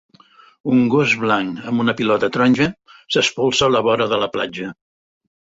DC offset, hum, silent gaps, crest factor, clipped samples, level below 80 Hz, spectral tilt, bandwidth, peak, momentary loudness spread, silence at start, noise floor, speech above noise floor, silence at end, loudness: under 0.1%; none; none; 16 dB; under 0.1%; -52 dBFS; -4.5 dB/octave; 8 kHz; -2 dBFS; 8 LU; 0.65 s; -50 dBFS; 32 dB; 0.85 s; -17 LUFS